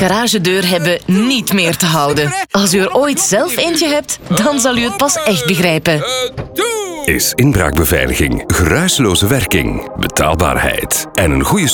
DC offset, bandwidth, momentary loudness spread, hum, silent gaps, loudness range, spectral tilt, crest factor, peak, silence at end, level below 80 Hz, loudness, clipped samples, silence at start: under 0.1%; over 20 kHz; 5 LU; none; none; 1 LU; -4 dB/octave; 12 dB; 0 dBFS; 0 s; -28 dBFS; -13 LUFS; under 0.1%; 0 s